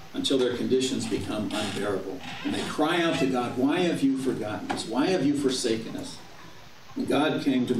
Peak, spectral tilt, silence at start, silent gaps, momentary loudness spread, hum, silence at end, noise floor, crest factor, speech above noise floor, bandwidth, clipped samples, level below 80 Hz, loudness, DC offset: -12 dBFS; -4.5 dB/octave; 0 s; none; 12 LU; none; 0 s; -49 dBFS; 14 dB; 22 dB; 14.5 kHz; under 0.1%; -60 dBFS; -27 LUFS; 0.5%